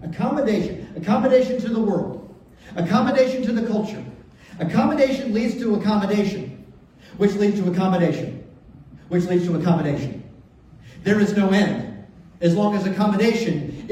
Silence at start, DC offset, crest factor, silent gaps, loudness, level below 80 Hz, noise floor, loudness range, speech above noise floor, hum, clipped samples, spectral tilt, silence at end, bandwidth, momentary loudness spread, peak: 0 s; under 0.1%; 18 dB; none; -21 LUFS; -52 dBFS; -47 dBFS; 2 LU; 27 dB; none; under 0.1%; -7 dB/octave; 0 s; 11 kHz; 13 LU; -4 dBFS